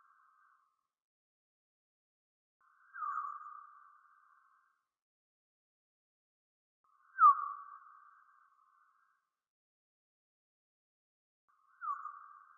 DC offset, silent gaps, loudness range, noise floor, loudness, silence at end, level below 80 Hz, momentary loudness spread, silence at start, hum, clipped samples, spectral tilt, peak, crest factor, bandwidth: under 0.1%; 5.02-6.84 s, 9.50-11.48 s; 16 LU; -79 dBFS; -32 LUFS; 0.4 s; under -90 dBFS; 28 LU; 2.95 s; none; under 0.1%; 14.5 dB/octave; -14 dBFS; 26 dB; 1.7 kHz